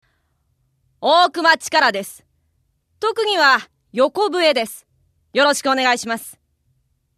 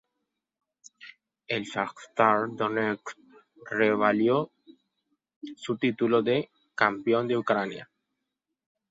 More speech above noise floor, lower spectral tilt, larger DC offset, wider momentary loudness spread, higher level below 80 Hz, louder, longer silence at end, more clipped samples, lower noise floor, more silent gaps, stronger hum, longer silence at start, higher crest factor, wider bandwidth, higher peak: second, 49 dB vs 58 dB; second, -1.5 dB/octave vs -6 dB/octave; neither; second, 14 LU vs 17 LU; first, -66 dBFS vs -72 dBFS; first, -17 LUFS vs -27 LUFS; second, 0.85 s vs 1.05 s; neither; second, -66 dBFS vs -84 dBFS; second, none vs 5.36-5.41 s; neither; about the same, 1 s vs 1 s; second, 18 dB vs 24 dB; first, 14 kHz vs 7.8 kHz; first, -2 dBFS vs -6 dBFS